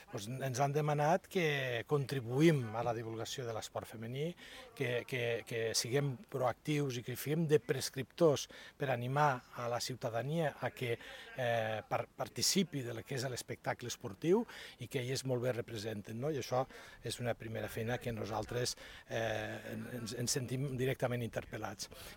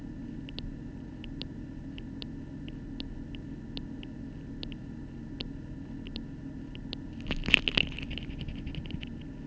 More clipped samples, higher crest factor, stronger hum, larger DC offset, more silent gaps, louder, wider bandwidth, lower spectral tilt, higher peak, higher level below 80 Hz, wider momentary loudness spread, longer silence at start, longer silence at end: neither; second, 20 dB vs 36 dB; neither; neither; neither; about the same, -37 LUFS vs -36 LUFS; first, 17 kHz vs 8 kHz; about the same, -4.5 dB/octave vs -5 dB/octave; second, -16 dBFS vs 0 dBFS; second, -66 dBFS vs -44 dBFS; second, 11 LU vs 14 LU; about the same, 0 s vs 0 s; about the same, 0 s vs 0 s